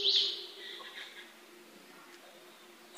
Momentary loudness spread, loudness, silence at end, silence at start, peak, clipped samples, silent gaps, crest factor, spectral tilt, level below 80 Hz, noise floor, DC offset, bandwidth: 25 LU; -34 LUFS; 0 s; 0 s; -16 dBFS; under 0.1%; none; 22 dB; 0.5 dB/octave; under -90 dBFS; -56 dBFS; under 0.1%; 15.5 kHz